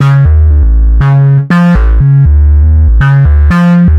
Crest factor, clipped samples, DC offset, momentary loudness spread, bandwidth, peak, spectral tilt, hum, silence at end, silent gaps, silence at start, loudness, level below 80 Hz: 4 dB; under 0.1%; under 0.1%; 2 LU; 5.4 kHz; 0 dBFS; -9.5 dB/octave; none; 0 s; none; 0 s; -7 LUFS; -8 dBFS